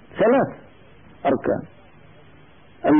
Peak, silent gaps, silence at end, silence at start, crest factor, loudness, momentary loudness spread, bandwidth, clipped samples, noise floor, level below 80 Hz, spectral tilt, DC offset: -8 dBFS; none; 0 s; 0.15 s; 14 dB; -22 LUFS; 10 LU; 3.6 kHz; under 0.1%; -50 dBFS; -56 dBFS; -11.5 dB/octave; 0.3%